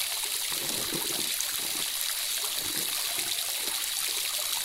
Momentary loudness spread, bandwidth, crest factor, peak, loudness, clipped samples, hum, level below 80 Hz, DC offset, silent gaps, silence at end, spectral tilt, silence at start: 1 LU; 16.5 kHz; 24 dB; -8 dBFS; -28 LUFS; under 0.1%; none; -64 dBFS; under 0.1%; none; 0 s; 1 dB/octave; 0 s